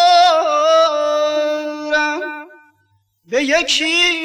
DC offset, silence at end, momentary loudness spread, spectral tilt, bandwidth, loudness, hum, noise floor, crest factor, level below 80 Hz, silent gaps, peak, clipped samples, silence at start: under 0.1%; 0 s; 11 LU; -0.5 dB/octave; 13 kHz; -15 LUFS; 50 Hz at -65 dBFS; -61 dBFS; 14 dB; -54 dBFS; none; -2 dBFS; under 0.1%; 0 s